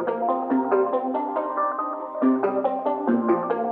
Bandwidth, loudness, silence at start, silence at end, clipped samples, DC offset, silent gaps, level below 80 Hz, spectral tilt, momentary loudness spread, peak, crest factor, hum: 4 kHz; -24 LUFS; 0 s; 0 s; under 0.1%; under 0.1%; none; -82 dBFS; -10 dB/octave; 4 LU; -8 dBFS; 16 dB; none